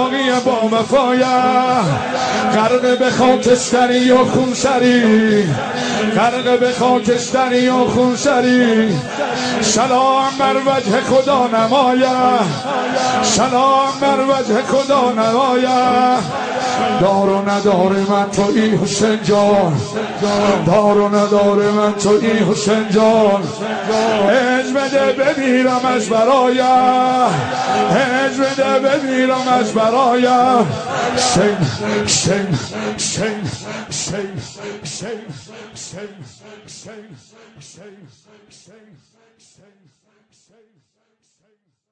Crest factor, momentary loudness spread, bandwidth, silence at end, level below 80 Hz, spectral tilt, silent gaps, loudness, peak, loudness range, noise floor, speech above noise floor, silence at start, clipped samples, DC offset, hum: 14 dB; 8 LU; 10 kHz; 4 s; -50 dBFS; -4.5 dB/octave; none; -14 LUFS; -2 dBFS; 5 LU; -66 dBFS; 51 dB; 0 s; under 0.1%; under 0.1%; none